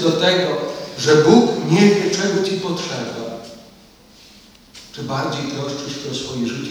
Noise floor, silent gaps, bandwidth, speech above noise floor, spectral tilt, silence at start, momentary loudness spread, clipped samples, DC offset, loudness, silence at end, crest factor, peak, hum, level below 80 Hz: -47 dBFS; none; 18 kHz; 30 dB; -5 dB/octave; 0 s; 16 LU; under 0.1%; under 0.1%; -18 LUFS; 0 s; 18 dB; 0 dBFS; none; -56 dBFS